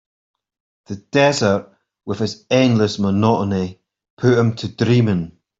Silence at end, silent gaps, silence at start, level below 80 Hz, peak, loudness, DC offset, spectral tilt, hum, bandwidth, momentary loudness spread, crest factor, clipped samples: 0.3 s; 4.10-4.17 s; 0.9 s; -56 dBFS; -2 dBFS; -18 LUFS; under 0.1%; -6.5 dB/octave; none; 7.8 kHz; 12 LU; 16 dB; under 0.1%